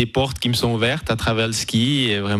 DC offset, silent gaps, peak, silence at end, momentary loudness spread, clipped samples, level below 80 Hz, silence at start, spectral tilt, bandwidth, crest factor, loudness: under 0.1%; none; -6 dBFS; 0 s; 3 LU; under 0.1%; -40 dBFS; 0 s; -4.5 dB/octave; 15.5 kHz; 14 dB; -20 LUFS